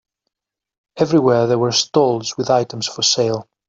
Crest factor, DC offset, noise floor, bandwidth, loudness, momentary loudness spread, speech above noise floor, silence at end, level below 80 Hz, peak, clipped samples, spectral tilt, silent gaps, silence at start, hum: 16 dB; under 0.1%; -86 dBFS; 7.8 kHz; -17 LUFS; 7 LU; 69 dB; 0.25 s; -60 dBFS; -2 dBFS; under 0.1%; -4 dB/octave; none; 0.95 s; none